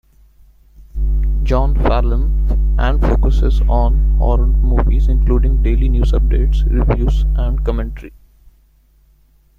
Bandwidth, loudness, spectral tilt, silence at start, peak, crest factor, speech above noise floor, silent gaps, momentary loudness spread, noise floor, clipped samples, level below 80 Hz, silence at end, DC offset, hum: 4.4 kHz; -16 LUFS; -8.5 dB/octave; 0.8 s; -2 dBFS; 12 dB; 39 dB; none; 4 LU; -51 dBFS; under 0.1%; -14 dBFS; 1.5 s; under 0.1%; none